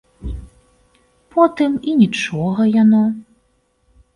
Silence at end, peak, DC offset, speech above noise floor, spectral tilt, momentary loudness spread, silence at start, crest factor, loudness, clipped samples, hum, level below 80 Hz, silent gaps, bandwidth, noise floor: 0.95 s; 0 dBFS; under 0.1%; 48 dB; -7 dB/octave; 19 LU; 0.25 s; 16 dB; -16 LUFS; under 0.1%; none; -40 dBFS; none; 10 kHz; -62 dBFS